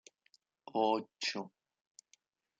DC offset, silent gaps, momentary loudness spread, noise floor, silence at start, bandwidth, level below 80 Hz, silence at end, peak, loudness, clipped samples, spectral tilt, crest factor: under 0.1%; none; 18 LU; -73 dBFS; 0.75 s; 9.4 kHz; under -90 dBFS; 1.1 s; -18 dBFS; -36 LUFS; under 0.1%; -3.5 dB/octave; 22 dB